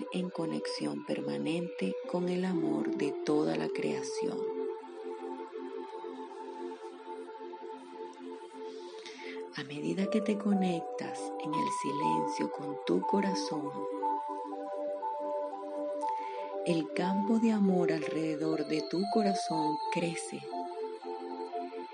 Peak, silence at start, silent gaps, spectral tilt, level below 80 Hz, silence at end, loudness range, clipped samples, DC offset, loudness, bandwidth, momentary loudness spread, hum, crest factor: -16 dBFS; 0 s; none; -6 dB/octave; -86 dBFS; 0 s; 12 LU; under 0.1%; under 0.1%; -34 LUFS; 10 kHz; 14 LU; none; 18 dB